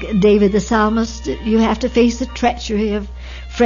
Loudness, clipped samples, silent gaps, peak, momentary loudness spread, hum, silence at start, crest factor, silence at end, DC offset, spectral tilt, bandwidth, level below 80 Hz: -16 LUFS; under 0.1%; none; -2 dBFS; 11 LU; none; 0 s; 14 dB; 0 s; under 0.1%; -6 dB/octave; 7.4 kHz; -30 dBFS